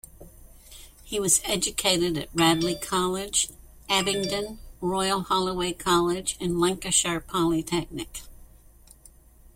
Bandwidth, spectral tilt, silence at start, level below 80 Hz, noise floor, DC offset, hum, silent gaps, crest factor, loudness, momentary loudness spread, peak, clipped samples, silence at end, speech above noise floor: 16.5 kHz; -3 dB/octave; 0.2 s; -48 dBFS; -53 dBFS; under 0.1%; none; none; 20 dB; -25 LUFS; 9 LU; -6 dBFS; under 0.1%; 0.05 s; 27 dB